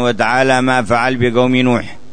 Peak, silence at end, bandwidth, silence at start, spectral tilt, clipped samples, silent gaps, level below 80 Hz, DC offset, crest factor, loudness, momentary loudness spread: -2 dBFS; 0.15 s; 9.6 kHz; 0 s; -5.5 dB/octave; under 0.1%; none; -46 dBFS; 4%; 12 dB; -13 LUFS; 3 LU